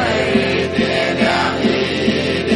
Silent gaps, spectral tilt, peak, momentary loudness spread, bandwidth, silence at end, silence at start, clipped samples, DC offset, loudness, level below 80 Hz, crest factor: none; -5 dB/octave; -2 dBFS; 2 LU; 11.5 kHz; 0 s; 0 s; under 0.1%; under 0.1%; -16 LUFS; -46 dBFS; 14 dB